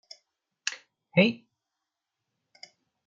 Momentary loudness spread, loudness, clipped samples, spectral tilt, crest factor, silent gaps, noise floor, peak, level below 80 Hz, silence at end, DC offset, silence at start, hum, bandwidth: 20 LU; -27 LUFS; under 0.1%; -5 dB/octave; 24 dB; none; -86 dBFS; -8 dBFS; -76 dBFS; 1.7 s; under 0.1%; 0.65 s; none; 7.8 kHz